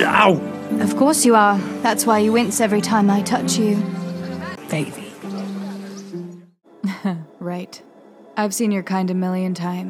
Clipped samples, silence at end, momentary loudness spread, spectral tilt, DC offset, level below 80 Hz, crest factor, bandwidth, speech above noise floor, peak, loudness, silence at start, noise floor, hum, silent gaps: under 0.1%; 0 s; 17 LU; -4.5 dB/octave; under 0.1%; -66 dBFS; 20 dB; 14.5 kHz; 25 dB; 0 dBFS; -19 LUFS; 0 s; -43 dBFS; none; none